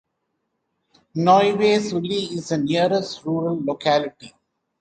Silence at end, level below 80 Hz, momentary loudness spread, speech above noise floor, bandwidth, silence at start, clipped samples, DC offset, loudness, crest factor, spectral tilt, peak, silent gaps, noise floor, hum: 0.5 s; -62 dBFS; 10 LU; 55 dB; 9.2 kHz; 1.15 s; under 0.1%; under 0.1%; -20 LUFS; 18 dB; -5.5 dB/octave; -4 dBFS; none; -75 dBFS; none